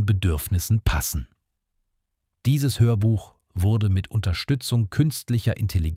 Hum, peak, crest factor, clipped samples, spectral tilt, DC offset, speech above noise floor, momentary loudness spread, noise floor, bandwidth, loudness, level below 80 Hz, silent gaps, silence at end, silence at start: none; -8 dBFS; 14 dB; under 0.1%; -6 dB/octave; under 0.1%; 55 dB; 7 LU; -77 dBFS; 16.5 kHz; -23 LUFS; -34 dBFS; none; 0 s; 0 s